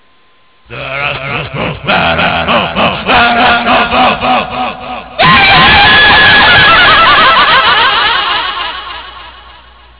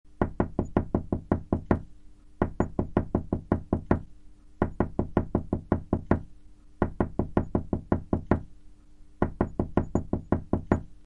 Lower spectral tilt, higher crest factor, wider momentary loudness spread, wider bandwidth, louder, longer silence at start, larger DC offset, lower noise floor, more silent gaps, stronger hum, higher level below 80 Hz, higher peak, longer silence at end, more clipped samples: second, -7 dB/octave vs -10 dB/octave; second, 8 dB vs 24 dB; first, 15 LU vs 3 LU; second, 4 kHz vs 7.4 kHz; first, -6 LUFS vs -30 LUFS; first, 0.7 s vs 0.05 s; first, 0.4% vs under 0.1%; about the same, -48 dBFS vs -49 dBFS; neither; neither; first, -30 dBFS vs -40 dBFS; first, 0 dBFS vs -6 dBFS; first, 0.6 s vs 0 s; neither